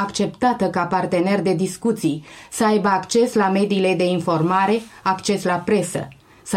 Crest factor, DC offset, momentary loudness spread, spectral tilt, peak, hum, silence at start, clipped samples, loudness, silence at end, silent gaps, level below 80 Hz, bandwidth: 14 dB; under 0.1%; 7 LU; -5.5 dB/octave; -6 dBFS; none; 0 s; under 0.1%; -20 LUFS; 0 s; none; -58 dBFS; 15.5 kHz